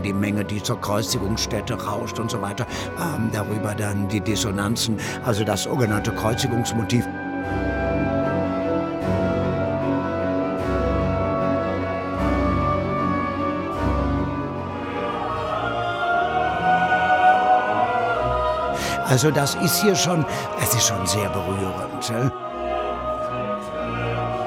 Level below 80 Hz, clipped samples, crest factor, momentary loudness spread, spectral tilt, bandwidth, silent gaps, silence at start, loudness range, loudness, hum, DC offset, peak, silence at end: -38 dBFS; under 0.1%; 16 dB; 8 LU; -4.5 dB/octave; 17 kHz; none; 0 s; 5 LU; -22 LUFS; none; under 0.1%; -6 dBFS; 0 s